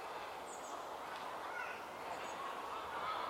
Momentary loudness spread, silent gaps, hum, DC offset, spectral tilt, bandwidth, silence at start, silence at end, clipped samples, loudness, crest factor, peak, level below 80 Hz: 3 LU; none; none; under 0.1%; -2 dB/octave; 16.5 kHz; 0 s; 0 s; under 0.1%; -45 LUFS; 14 dB; -30 dBFS; -76 dBFS